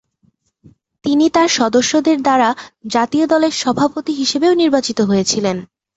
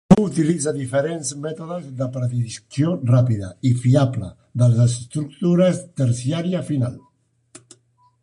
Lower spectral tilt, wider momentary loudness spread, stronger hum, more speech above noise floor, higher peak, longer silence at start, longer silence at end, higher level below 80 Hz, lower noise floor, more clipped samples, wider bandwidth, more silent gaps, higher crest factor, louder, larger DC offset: second, -4 dB/octave vs -7 dB/octave; second, 6 LU vs 11 LU; neither; about the same, 45 dB vs 42 dB; about the same, -2 dBFS vs -2 dBFS; first, 1.05 s vs 0.1 s; second, 0.3 s vs 1.25 s; second, -56 dBFS vs -50 dBFS; about the same, -60 dBFS vs -62 dBFS; neither; second, 8.2 kHz vs 11 kHz; neither; about the same, 14 dB vs 18 dB; first, -15 LUFS vs -21 LUFS; neither